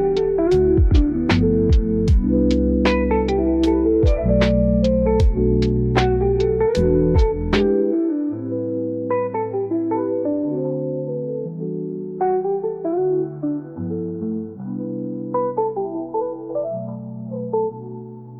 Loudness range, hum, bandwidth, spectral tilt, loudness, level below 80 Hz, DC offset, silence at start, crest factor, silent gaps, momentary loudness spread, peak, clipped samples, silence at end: 8 LU; none; 8 kHz; -8.5 dB/octave; -20 LUFS; -26 dBFS; under 0.1%; 0 s; 14 dB; none; 10 LU; -4 dBFS; under 0.1%; 0 s